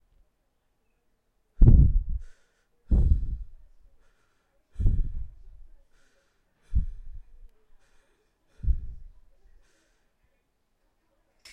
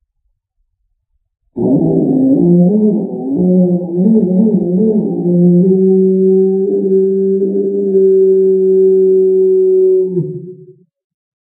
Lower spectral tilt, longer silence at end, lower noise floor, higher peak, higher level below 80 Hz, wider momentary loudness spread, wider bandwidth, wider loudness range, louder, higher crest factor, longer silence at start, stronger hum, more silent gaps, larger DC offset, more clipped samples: second, -10.5 dB/octave vs -14 dB/octave; first, 2.5 s vs 0.75 s; first, -72 dBFS vs -65 dBFS; second, -4 dBFS vs 0 dBFS; first, -28 dBFS vs -54 dBFS; first, 24 LU vs 6 LU; first, 5.6 kHz vs 1 kHz; first, 14 LU vs 2 LU; second, -27 LUFS vs -11 LUFS; first, 24 dB vs 12 dB; about the same, 1.6 s vs 1.55 s; neither; neither; neither; neither